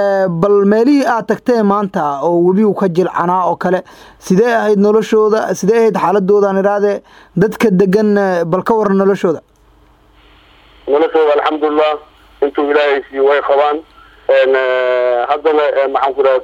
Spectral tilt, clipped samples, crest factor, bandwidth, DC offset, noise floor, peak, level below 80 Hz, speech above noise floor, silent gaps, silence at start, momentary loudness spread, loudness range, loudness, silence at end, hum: -6.5 dB/octave; under 0.1%; 12 dB; 15.5 kHz; under 0.1%; -48 dBFS; 0 dBFS; -52 dBFS; 36 dB; none; 0 s; 6 LU; 3 LU; -13 LUFS; 0 s; none